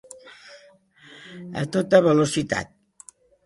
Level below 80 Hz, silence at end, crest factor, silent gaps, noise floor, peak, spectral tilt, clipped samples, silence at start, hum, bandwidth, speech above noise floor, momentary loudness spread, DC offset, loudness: -58 dBFS; 0.8 s; 24 dB; none; -53 dBFS; -2 dBFS; -5.5 dB/octave; under 0.1%; 0.25 s; none; 11.5 kHz; 33 dB; 27 LU; under 0.1%; -21 LUFS